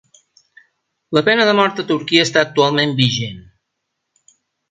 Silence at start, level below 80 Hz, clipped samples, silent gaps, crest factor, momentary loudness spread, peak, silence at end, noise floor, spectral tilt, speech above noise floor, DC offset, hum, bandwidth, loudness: 1.1 s; -58 dBFS; under 0.1%; none; 18 dB; 7 LU; 0 dBFS; 1.3 s; -75 dBFS; -4.5 dB/octave; 60 dB; under 0.1%; none; 9.4 kHz; -15 LUFS